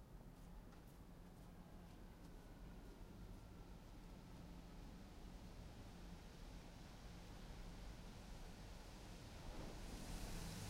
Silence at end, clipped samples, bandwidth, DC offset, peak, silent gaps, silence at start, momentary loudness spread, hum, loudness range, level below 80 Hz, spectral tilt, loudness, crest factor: 0 s; under 0.1%; 16 kHz; under 0.1%; -38 dBFS; none; 0 s; 7 LU; none; 4 LU; -58 dBFS; -5 dB/octave; -59 LUFS; 18 dB